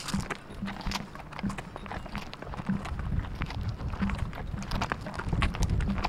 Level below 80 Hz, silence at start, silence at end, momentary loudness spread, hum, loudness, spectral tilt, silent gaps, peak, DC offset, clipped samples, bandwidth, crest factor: -38 dBFS; 0 s; 0 s; 9 LU; none; -34 LUFS; -5.5 dB/octave; none; -8 dBFS; under 0.1%; under 0.1%; 15 kHz; 24 dB